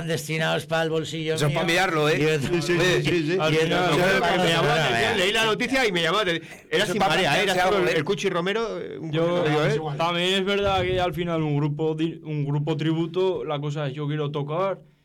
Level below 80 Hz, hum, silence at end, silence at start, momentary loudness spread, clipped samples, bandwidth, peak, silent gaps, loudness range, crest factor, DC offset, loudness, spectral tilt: -50 dBFS; none; 0.25 s; 0 s; 7 LU; under 0.1%; 18 kHz; -16 dBFS; none; 5 LU; 8 dB; under 0.1%; -23 LUFS; -5 dB/octave